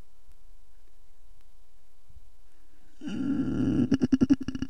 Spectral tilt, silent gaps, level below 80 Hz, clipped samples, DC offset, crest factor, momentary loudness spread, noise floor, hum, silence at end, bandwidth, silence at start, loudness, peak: -7.5 dB/octave; none; -50 dBFS; under 0.1%; 2%; 20 dB; 12 LU; -60 dBFS; none; 0 s; 8.8 kHz; 2.15 s; -27 LUFS; -10 dBFS